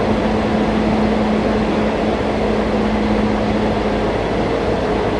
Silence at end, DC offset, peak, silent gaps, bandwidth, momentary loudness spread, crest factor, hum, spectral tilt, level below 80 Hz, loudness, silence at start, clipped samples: 0 s; under 0.1%; -4 dBFS; none; 10 kHz; 2 LU; 14 dB; none; -7 dB/octave; -30 dBFS; -17 LUFS; 0 s; under 0.1%